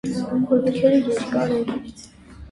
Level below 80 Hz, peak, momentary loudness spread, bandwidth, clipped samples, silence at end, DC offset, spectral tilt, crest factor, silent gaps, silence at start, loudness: -50 dBFS; -6 dBFS; 11 LU; 11.5 kHz; under 0.1%; 0 s; under 0.1%; -6.5 dB/octave; 16 dB; none; 0.05 s; -21 LUFS